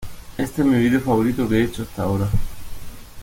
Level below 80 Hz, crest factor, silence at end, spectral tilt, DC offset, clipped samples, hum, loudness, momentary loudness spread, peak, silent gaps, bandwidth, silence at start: -34 dBFS; 14 dB; 0 s; -7 dB/octave; under 0.1%; under 0.1%; none; -21 LUFS; 22 LU; -6 dBFS; none; 17 kHz; 0 s